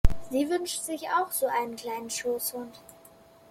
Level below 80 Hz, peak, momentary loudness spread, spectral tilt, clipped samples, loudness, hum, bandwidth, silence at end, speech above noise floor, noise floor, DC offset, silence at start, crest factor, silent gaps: -36 dBFS; -6 dBFS; 10 LU; -4 dB/octave; under 0.1%; -30 LUFS; none; 16.5 kHz; 0.7 s; 24 dB; -55 dBFS; under 0.1%; 0.05 s; 22 dB; none